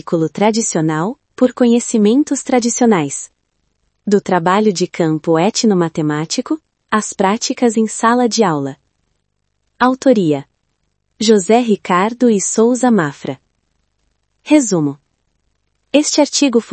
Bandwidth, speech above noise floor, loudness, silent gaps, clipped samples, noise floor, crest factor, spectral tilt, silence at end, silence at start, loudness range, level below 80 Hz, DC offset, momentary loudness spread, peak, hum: 8.8 kHz; 55 dB; -14 LUFS; none; under 0.1%; -68 dBFS; 16 dB; -4.5 dB/octave; 0 s; 0.05 s; 3 LU; -62 dBFS; under 0.1%; 9 LU; 0 dBFS; none